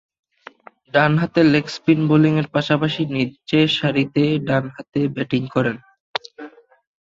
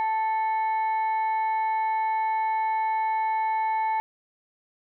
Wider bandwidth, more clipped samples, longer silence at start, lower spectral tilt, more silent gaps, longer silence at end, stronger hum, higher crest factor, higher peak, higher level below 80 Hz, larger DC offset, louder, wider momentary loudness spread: first, 7.6 kHz vs 4.2 kHz; neither; first, 0.95 s vs 0 s; first, -7 dB/octave vs -1 dB/octave; first, 6.00-6.14 s vs none; second, 0.55 s vs 1 s; neither; first, 18 dB vs 4 dB; first, -2 dBFS vs -22 dBFS; first, -56 dBFS vs -84 dBFS; neither; first, -19 LUFS vs -26 LUFS; first, 13 LU vs 0 LU